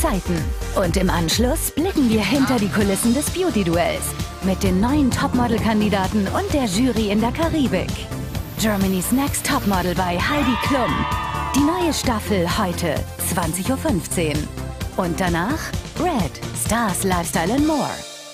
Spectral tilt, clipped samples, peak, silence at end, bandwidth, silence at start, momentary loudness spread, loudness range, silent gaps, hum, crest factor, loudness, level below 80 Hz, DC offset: -5 dB/octave; under 0.1%; -4 dBFS; 0 s; 15.5 kHz; 0 s; 6 LU; 3 LU; none; none; 16 dB; -20 LUFS; -32 dBFS; under 0.1%